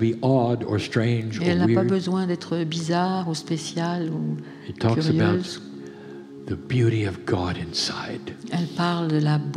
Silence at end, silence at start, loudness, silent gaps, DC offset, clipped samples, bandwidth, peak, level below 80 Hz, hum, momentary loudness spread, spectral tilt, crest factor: 0 s; 0 s; -24 LUFS; none; under 0.1%; under 0.1%; 11.5 kHz; -8 dBFS; -56 dBFS; none; 13 LU; -6.5 dB/octave; 16 dB